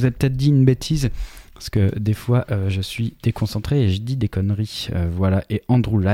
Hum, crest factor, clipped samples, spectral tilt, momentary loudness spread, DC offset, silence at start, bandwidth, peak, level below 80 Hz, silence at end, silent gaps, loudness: none; 18 dB; under 0.1%; -7 dB/octave; 8 LU; under 0.1%; 0 s; 16 kHz; -2 dBFS; -36 dBFS; 0 s; none; -21 LUFS